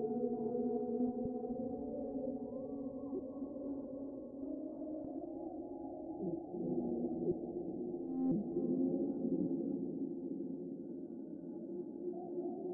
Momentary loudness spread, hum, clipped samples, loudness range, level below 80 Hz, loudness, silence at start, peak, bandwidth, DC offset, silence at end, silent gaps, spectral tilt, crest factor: 9 LU; none; under 0.1%; 6 LU; -70 dBFS; -41 LUFS; 0 s; -24 dBFS; 1.5 kHz; under 0.1%; 0 s; none; -4 dB/octave; 16 dB